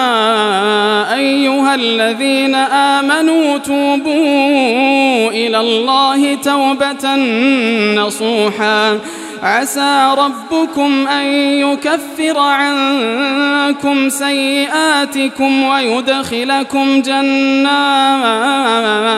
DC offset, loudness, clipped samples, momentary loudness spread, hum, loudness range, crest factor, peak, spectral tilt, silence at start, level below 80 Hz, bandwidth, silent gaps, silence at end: under 0.1%; -12 LUFS; under 0.1%; 4 LU; none; 1 LU; 12 dB; 0 dBFS; -3 dB/octave; 0 s; -60 dBFS; 14.5 kHz; none; 0 s